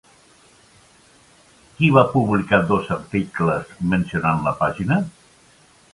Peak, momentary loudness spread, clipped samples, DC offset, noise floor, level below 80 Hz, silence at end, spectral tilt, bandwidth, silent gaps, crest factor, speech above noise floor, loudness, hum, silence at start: 0 dBFS; 9 LU; under 0.1%; under 0.1%; -53 dBFS; -48 dBFS; 0.85 s; -7.5 dB/octave; 11.5 kHz; none; 22 dB; 34 dB; -20 LUFS; none; 1.8 s